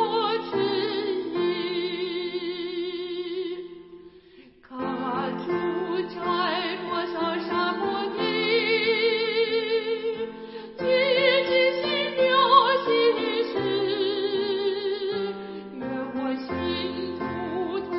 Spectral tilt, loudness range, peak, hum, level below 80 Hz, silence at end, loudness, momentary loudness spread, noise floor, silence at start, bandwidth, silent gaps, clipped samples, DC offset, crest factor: -8.5 dB/octave; 10 LU; -4 dBFS; none; -64 dBFS; 0 s; -25 LUFS; 11 LU; -52 dBFS; 0 s; 5.8 kHz; none; under 0.1%; under 0.1%; 20 dB